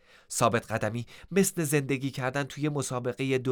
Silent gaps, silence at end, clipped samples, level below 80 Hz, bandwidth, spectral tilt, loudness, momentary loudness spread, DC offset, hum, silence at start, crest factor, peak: none; 0 s; under 0.1%; -62 dBFS; over 20 kHz; -5 dB/octave; -29 LUFS; 6 LU; under 0.1%; none; 0.3 s; 20 dB; -10 dBFS